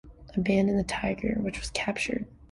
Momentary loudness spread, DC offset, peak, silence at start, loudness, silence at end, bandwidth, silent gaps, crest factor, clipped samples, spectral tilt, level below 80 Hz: 6 LU; under 0.1%; -12 dBFS; 0.05 s; -29 LUFS; 0.05 s; 11.5 kHz; none; 18 dB; under 0.1%; -5.5 dB/octave; -46 dBFS